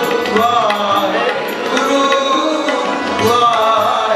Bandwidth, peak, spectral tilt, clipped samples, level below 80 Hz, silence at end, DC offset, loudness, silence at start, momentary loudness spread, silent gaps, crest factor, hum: 15.5 kHz; 0 dBFS; -3.5 dB/octave; under 0.1%; -58 dBFS; 0 s; under 0.1%; -14 LUFS; 0 s; 5 LU; none; 14 dB; none